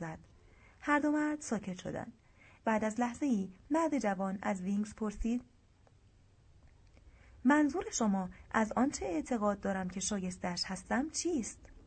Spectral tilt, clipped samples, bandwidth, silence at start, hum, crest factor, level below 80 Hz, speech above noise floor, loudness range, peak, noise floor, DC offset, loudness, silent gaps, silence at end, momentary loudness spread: -4.5 dB/octave; under 0.1%; 9.2 kHz; 0 s; none; 20 dB; -56 dBFS; 31 dB; 4 LU; -14 dBFS; -64 dBFS; under 0.1%; -35 LUFS; none; 0.05 s; 9 LU